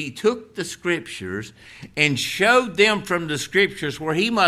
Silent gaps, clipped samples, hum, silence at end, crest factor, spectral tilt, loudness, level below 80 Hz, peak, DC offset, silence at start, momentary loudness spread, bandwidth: none; under 0.1%; none; 0 s; 20 dB; -4 dB/octave; -21 LUFS; -56 dBFS; -2 dBFS; under 0.1%; 0 s; 14 LU; 15.5 kHz